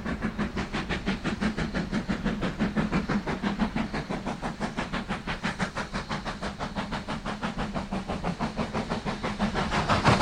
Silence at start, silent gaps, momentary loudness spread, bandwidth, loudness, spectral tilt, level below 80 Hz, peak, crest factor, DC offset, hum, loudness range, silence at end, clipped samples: 0 s; none; 6 LU; 11 kHz; -30 LUFS; -5.5 dB/octave; -40 dBFS; -6 dBFS; 22 dB; under 0.1%; none; 3 LU; 0 s; under 0.1%